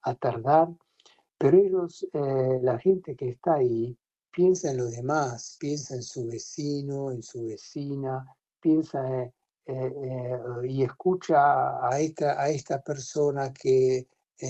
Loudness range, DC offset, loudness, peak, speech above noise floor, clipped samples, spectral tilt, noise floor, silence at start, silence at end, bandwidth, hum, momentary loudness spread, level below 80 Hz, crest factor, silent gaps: 6 LU; under 0.1%; -27 LUFS; -8 dBFS; 36 dB; under 0.1%; -6.5 dB/octave; -62 dBFS; 0.05 s; 0 s; 8.2 kHz; none; 12 LU; -64 dBFS; 20 dB; none